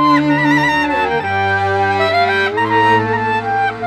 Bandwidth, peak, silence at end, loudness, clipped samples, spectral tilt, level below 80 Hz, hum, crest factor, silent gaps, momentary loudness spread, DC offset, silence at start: 13 kHz; -2 dBFS; 0 s; -14 LUFS; under 0.1%; -6 dB/octave; -46 dBFS; none; 12 dB; none; 4 LU; under 0.1%; 0 s